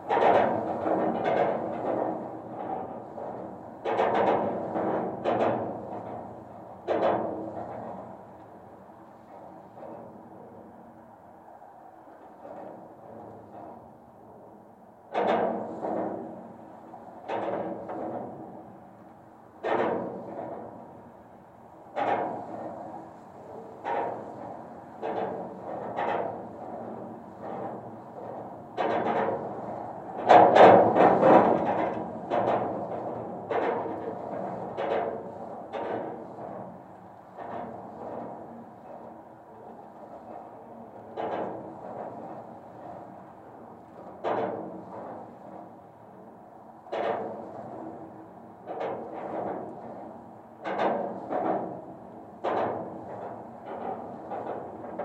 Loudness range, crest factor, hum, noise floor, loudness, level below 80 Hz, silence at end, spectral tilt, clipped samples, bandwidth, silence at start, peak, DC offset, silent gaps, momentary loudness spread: 21 LU; 30 dB; none; -52 dBFS; -28 LUFS; -70 dBFS; 0 s; -7.5 dB/octave; under 0.1%; 8.4 kHz; 0 s; 0 dBFS; under 0.1%; none; 21 LU